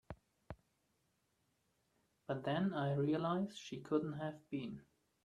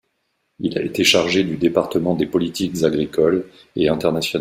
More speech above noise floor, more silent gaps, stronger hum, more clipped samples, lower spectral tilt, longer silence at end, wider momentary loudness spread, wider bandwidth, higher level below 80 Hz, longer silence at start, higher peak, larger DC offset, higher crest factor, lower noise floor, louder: second, 42 dB vs 52 dB; neither; neither; neither; first, -7.5 dB/octave vs -4.5 dB/octave; first, 0.45 s vs 0 s; first, 21 LU vs 9 LU; second, 10.5 kHz vs 16 kHz; second, -72 dBFS vs -52 dBFS; second, 0.1 s vs 0.6 s; second, -24 dBFS vs 0 dBFS; neither; about the same, 18 dB vs 20 dB; first, -81 dBFS vs -70 dBFS; second, -40 LUFS vs -19 LUFS